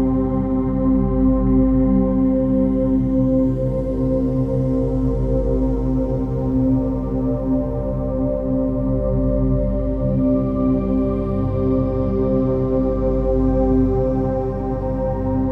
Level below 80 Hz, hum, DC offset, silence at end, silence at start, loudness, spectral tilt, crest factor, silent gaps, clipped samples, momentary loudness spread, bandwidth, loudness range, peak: -26 dBFS; 50 Hz at -30 dBFS; under 0.1%; 0 s; 0 s; -19 LUFS; -12 dB/octave; 12 dB; none; under 0.1%; 5 LU; 3 kHz; 3 LU; -6 dBFS